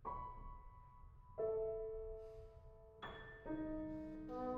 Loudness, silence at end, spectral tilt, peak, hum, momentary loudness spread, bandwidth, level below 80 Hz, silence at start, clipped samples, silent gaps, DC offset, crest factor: -48 LUFS; 0 s; -8.5 dB/octave; -32 dBFS; none; 19 LU; 5.6 kHz; -58 dBFS; 0 s; under 0.1%; none; under 0.1%; 16 dB